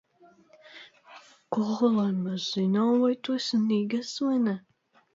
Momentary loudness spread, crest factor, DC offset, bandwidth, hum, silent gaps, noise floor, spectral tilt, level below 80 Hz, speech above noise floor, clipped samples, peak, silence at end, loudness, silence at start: 11 LU; 16 dB; under 0.1%; 7.8 kHz; none; none; -58 dBFS; -6 dB/octave; -76 dBFS; 33 dB; under 0.1%; -12 dBFS; 0.55 s; -27 LUFS; 0.75 s